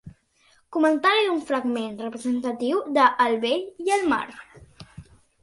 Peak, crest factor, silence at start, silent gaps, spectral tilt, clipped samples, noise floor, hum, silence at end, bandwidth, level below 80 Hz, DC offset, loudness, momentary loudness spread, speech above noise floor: -6 dBFS; 20 dB; 0.05 s; none; -4 dB/octave; under 0.1%; -62 dBFS; none; 0.4 s; 11.5 kHz; -60 dBFS; under 0.1%; -23 LUFS; 10 LU; 39 dB